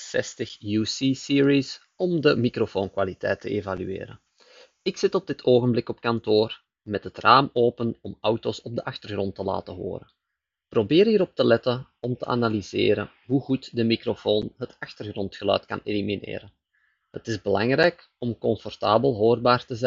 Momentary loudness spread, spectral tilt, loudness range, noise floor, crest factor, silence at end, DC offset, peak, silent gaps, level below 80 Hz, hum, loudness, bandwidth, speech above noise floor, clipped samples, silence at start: 13 LU; -4.5 dB/octave; 5 LU; -84 dBFS; 24 dB; 0 s; under 0.1%; 0 dBFS; none; -60 dBFS; none; -24 LUFS; 7.6 kHz; 60 dB; under 0.1%; 0 s